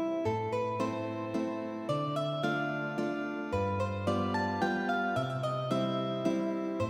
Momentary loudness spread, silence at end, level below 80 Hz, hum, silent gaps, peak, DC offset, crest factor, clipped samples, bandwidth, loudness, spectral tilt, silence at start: 4 LU; 0 s; -64 dBFS; none; none; -16 dBFS; under 0.1%; 16 dB; under 0.1%; 15.5 kHz; -33 LUFS; -7 dB/octave; 0 s